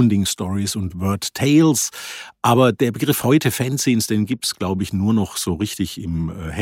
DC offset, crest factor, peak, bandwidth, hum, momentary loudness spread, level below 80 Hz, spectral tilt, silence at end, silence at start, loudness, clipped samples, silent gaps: under 0.1%; 16 dB; -2 dBFS; 17 kHz; none; 10 LU; -44 dBFS; -5 dB/octave; 0 s; 0 s; -19 LUFS; under 0.1%; none